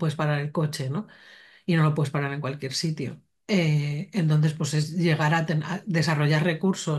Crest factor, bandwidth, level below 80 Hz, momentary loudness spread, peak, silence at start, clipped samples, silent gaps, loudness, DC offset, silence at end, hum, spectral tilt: 16 dB; 12.5 kHz; -66 dBFS; 9 LU; -8 dBFS; 0 s; under 0.1%; none; -25 LUFS; under 0.1%; 0 s; none; -6 dB/octave